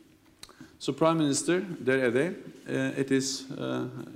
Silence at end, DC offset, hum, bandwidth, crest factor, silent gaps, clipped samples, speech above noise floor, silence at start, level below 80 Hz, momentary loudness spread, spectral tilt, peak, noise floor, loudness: 0 s; under 0.1%; none; 15.5 kHz; 20 dB; none; under 0.1%; 25 dB; 0.45 s; -70 dBFS; 11 LU; -4.5 dB/octave; -10 dBFS; -53 dBFS; -28 LUFS